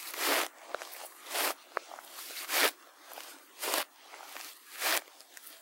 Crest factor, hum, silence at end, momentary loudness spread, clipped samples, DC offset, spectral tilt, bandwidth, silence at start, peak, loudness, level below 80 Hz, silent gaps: 28 dB; none; 0 s; 20 LU; under 0.1%; under 0.1%; 3 dB/octave; 16 kHz; 0 s; -8 dBFS; -33 LUFS; under -90 dBFS; none